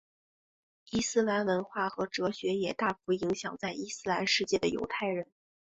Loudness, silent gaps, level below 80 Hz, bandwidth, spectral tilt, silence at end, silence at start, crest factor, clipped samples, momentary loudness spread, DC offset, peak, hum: -32 LUFS; none; -64 dBFS; 8.2 kHz; -4 dB/octave; 0.55 s; 0.9 s; 18 dB; under 0.1%; 8 LU; under 0.1%; -14 dBFS; none